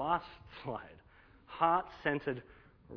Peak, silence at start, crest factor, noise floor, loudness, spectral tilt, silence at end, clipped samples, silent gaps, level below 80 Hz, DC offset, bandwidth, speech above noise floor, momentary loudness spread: -14 dBFS; 0 s; 22 dB; -61 dBFS; -36 LUFS; -8 dB/octave; 0 s; under 0.1%; none; -62 dBFS; under 0.1%; 5.4 kHz; 25 dB; 20 LU